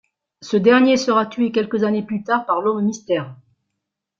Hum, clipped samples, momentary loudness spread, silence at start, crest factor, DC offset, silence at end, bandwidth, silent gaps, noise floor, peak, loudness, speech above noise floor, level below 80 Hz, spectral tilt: none; under 0.1%; 10 LU; 0.4 s; 16 dB; under 0.1%; 0.85 s; 7.6 kHz; none; -79 dBFS; -2 dBFS; -18 LUFS; 62 dB; -64 dBFS; -5.5 dB/octave